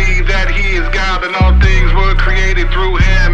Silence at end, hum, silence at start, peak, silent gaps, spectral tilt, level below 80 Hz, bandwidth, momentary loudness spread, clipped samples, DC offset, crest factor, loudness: 0 s; none; 0 s; 0 dBFS; none; -5.5 dB/octave; -10 dBFS; 7.2 kHz; 4 LU; under 0.1%; under 0.1%; 10 dB; -13 LUFS